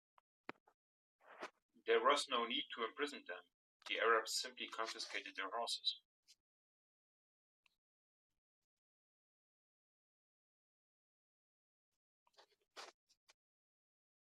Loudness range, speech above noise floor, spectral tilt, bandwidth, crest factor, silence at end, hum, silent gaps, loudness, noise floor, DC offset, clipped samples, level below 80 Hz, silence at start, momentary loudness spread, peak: 8 LU; over 49 dB; 0 dB/octave; 13 kHz; 26 dB; 1.4 s; none; 1.62-1.69 s, 3.54-3.80 s, 6.05-6.23 s, 6.40-7.63 s, 7.78-8.30 s, 8.38-12.26 s; -40 LUFS; under -90 dBFS; under 0.1%; under 0.1%; under -90 dBFS; 1.25 s; 22 LU; -20 dBFS